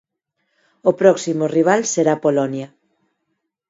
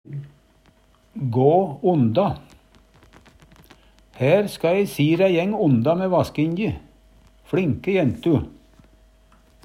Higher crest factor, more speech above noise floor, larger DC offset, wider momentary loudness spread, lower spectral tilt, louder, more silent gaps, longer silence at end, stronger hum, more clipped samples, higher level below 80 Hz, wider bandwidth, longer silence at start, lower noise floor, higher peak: about the same, 20 dB vs 18 dB; first, 58 dB vs 37 dB; neither; second, 9 LU vs 13 LU; second, -5 dB/octave vs -8 dB/octave; first, -17 LUFS vs -20 LUFS; neither; about the same, 1.05 s vs 1.15 s; neither; neither; second, -68 dBFS vs -52 dBFS; second, 8 kHz vs 16 kHz; first, 0.85 s vs 0.1 s; first, -74 dBFS vs -57 dBFS; first, 0 dBFS vs -4 dBFS